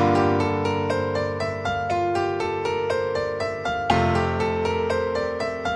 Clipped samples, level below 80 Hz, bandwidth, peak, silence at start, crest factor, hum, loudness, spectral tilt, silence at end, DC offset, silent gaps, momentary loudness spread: under 0.1%; -46 dBFS; 11.5 kHz; -4 dBFS; 0 s; 18 dB; none; -24 LUFS; -6.5 dB/octave; 0 s; under 0.1%; none; 6 LU